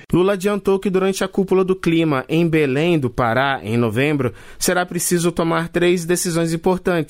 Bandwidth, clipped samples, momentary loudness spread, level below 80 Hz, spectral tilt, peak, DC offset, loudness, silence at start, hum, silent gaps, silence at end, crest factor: 16 kHz; under 0.1%; 3 LU; -44 dBFS; -5 dB/octave; -6 dBFS; under 0.1%; -18 LUFS; 0.1 s; none; none; 0 s; 12 dB